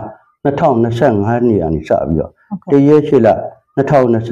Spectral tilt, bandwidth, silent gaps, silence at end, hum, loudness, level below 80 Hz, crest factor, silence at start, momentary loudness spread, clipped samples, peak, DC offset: -9 dB/octave; 8 kHz; none; 0 s; none; -13 LUFS; -38 dBFS; 12 dB; 0 s; 11 LU; under 0.1%; 0 dBFS; under 0.1%